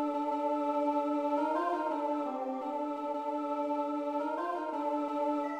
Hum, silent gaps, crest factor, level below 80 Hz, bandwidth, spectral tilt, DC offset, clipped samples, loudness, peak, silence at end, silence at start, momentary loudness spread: none; none; 14 dB; -78 dBFS; 9.2 kHz; -4.5 dB/octave; under 0.1%; under 0.1%; -33 LUFS; -20 dBFS; 0 s; 0 s; 5 LU